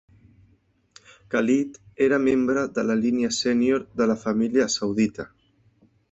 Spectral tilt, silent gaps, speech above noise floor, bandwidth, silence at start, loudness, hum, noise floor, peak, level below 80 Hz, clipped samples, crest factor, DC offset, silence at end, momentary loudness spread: -4.5 dB/octave; none; 41 dB; 8.2 kHz; 1.3 s; -23 LUFS; none; -63 dBFS; -8 dBFS; -60 dBFS; under 0.1%; 16 dB; under 0.1%; 0.85 s; 5 LU